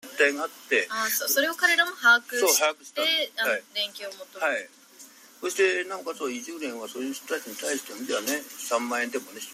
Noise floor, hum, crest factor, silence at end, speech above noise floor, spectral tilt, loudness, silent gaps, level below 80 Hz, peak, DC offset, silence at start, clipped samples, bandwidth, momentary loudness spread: -51 dBFS; none; 20 dB; 0 s; 24 dB; 0 dB/octave; -26 LUFS; none; -82 dBFS; -6 dBFS; under 0.1%; 0.05 s; under 0.1%; 16 kHz; 13 LU